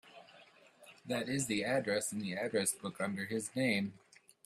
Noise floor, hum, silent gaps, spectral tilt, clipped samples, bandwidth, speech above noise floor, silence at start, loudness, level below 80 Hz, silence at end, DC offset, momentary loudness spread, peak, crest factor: -62 dBFS; none; none; -3.5 dB/octave; under 0.1%; 15.5 kHz; 26 dB; 0.05 s; -36 LUFS; -76 dBFS; 0.5 s; under 0.1%; 9 LU; -20 dBFS; 18 dB